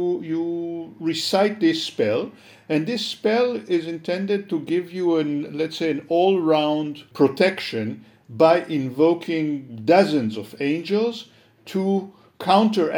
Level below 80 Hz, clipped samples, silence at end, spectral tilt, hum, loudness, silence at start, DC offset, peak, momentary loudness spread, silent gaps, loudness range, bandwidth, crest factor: -74 dBFS; under 0.1%; 0 s; -6 dB/octave; none; -22 LUFS; 0 s; under 0.1%; -2 dBFS; 11 LU; none; 3 LU; 19 kHz; 20 dB